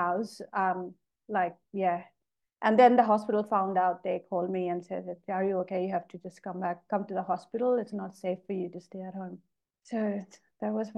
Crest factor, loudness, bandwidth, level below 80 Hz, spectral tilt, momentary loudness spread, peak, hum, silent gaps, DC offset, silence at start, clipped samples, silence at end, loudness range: 20 dB; -30 LUFS; 11.5 kHz; -80 dBFS; -7 dB/octave; 14 LU; -10 dBFS; none; none; under 0.1%; 0 s; under 0.1%; 0 s; 7 LU